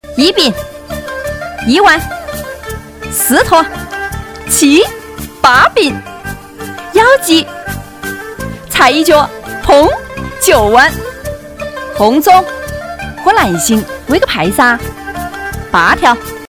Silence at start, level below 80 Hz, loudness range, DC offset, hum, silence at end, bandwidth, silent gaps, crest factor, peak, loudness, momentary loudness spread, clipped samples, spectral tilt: 0.05 s; -32 dBFS; 3 LU; under 0.1%; none; 0 s; 16 kHz; none; 12 dB; 0 dBFS; -10 LUFS; 17 LU; 2%; -3 dB/octave